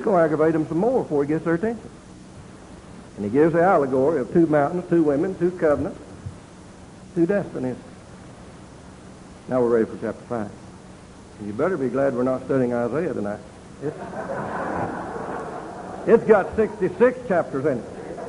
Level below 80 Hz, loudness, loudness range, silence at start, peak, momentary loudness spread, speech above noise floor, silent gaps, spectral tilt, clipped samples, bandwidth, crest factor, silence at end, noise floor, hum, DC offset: -50 dBFS; -22 LUFS; 7 LU; 0 s; -2 dBFS; 24 LU; 22 dB; none; -8 dB/octave; under 0.1%; 11 kHz; 20 dB; 0 s; -43 dBFS; none; under 0.1%